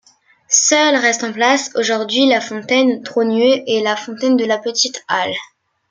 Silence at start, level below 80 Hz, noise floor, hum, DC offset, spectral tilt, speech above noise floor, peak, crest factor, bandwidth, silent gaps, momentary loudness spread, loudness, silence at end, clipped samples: 0.5 s; -68 dBFS; -43 dBFS; none; under 0.1%; -1.5 dB/octave; 28 dB; -2 dBFS; 16 dB; 10 kHz; none; 7 LU; -15 LUFS; 0.45 s; under 0.1%